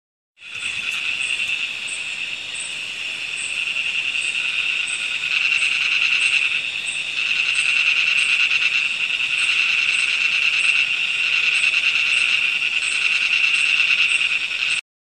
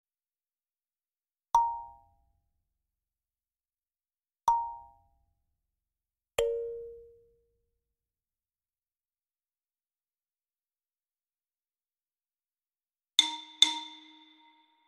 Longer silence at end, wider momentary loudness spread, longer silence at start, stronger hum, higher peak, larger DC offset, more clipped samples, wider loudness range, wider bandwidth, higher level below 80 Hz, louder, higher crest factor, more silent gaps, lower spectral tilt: second, 0.2 s vs 0.9 s; second, 9 LU vs 21 LU; second, 0.4 s vs 1.55 s; neither; about the same, -4 dBFS vs -4 dBFS; first, 0.1% vs under 0.1%; neither; second, 6 LU vs 9 LU; second, 13.5 kHz vs 15.5 kHz; about the same, -66 dBFS vs -66 dBFS; first, -17 LUFS vs -29 LUFS; second, 16 dB vs 34 dB; neither; second, 2 dB/octave vs 0.5 dB/octave